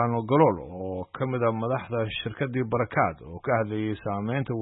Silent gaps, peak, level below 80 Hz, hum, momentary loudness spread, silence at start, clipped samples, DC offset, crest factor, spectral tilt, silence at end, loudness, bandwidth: none; -6 dBFS; -56 dBFS; none; 11 LU; 0 s; under 0.1%; under 0.1%; 22 dB; -11.5 dB/octave; 0 s; -27 LUFS; 4 kHz